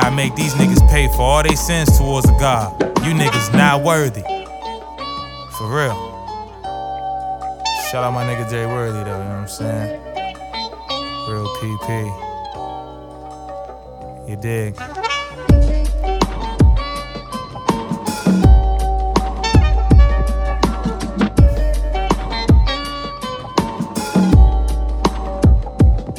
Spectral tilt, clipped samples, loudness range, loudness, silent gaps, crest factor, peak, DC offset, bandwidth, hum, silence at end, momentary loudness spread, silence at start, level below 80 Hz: -5.5 dB/octave; under 0.1%; 11 LU; -17 LUFS; none; 16 dB; 0 dBFS; under 0.1%; 17.5 kHz; none; 0 s; 15 LU; 0 s; -20 dBFS